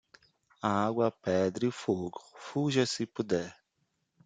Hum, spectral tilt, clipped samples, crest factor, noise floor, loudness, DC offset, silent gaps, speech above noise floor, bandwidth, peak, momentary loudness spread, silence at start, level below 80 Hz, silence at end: none; -5.5 dB/octave; under 0.1%; 20 dB; -79 dBFS; -31 LUFS; under 0.1%; none; 48 dB; 9.4 kHz; -14 dBFS; 9 LU; 0.65 s; -72 dBFS; 0.75 s